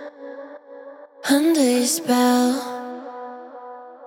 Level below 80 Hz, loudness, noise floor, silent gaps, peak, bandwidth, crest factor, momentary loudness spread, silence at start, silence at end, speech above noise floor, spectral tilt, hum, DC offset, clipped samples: under -90 dBFS; -19 LUFS; -41 dBFS; none; -6 dBFS; 17.5 kHz; 16 dB; 23 LU; 0 s; 0 s; 23 dB; -2 dB/octave; none; under 0.1%; under 0.1%